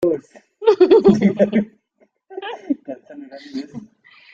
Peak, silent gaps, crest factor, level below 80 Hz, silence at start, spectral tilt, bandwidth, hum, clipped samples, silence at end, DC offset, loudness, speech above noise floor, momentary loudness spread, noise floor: -2 dBFS; none; 16 dB; -56 dBFS; 0 s; -8 dB/octave; 7.4 kHz; none; under 0.1%; 0.5 s; under 0.1%; -16 LUFS; 43 dB; 25 LU; -61 dBFS